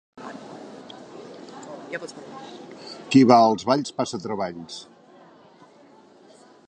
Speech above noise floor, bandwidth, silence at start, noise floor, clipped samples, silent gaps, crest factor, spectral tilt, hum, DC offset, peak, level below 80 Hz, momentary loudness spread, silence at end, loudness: 30 dB; 9.6 kHz; 0.2 s; -52 dBFS; under 0.1%; none; 24 dB; -5.5 dB/octave; none; under 0.1%; -2 dBFS; -68 dBFS; 25 LU; 1.85 s; -21 LUFS